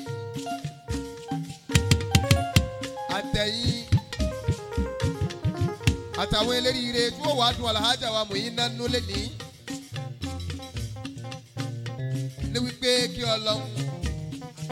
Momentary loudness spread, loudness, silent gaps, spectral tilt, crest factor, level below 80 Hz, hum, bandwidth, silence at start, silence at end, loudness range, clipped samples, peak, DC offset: 13 LU; -27 LUFS; none; -4.5 dB/octave; 24 dB; -40 dBFS; none; 16.5 kHz; 0 s; 0 s; 7 LU; under 0.1%; -2 dBFS; under 0.1%